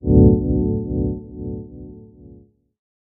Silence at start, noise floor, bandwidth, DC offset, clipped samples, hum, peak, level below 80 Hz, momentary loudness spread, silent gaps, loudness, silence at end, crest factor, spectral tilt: 0.05 s; -48 dBFS; 1.2 kHz; under 0.1%; under 0.1%; 60 Hz at -40 dBFS; -2 dBFS; -28 dBFS; 25 LU; none; -19 LUFS; 1.05 s; 18 dB; -10.5 dB/octave